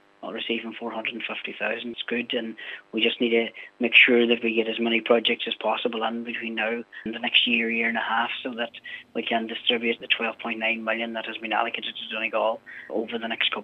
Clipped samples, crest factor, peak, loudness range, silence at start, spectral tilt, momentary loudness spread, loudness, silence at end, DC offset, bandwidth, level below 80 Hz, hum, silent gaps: under 0.1%; 24 dB; -2 dBFS; 6 LU; 0.2 s; -5.5 dB/octave; 13 LU; -24 LUFS; 0 s; under 0.1%; 5.8 kHz; -78 dBFS; none; none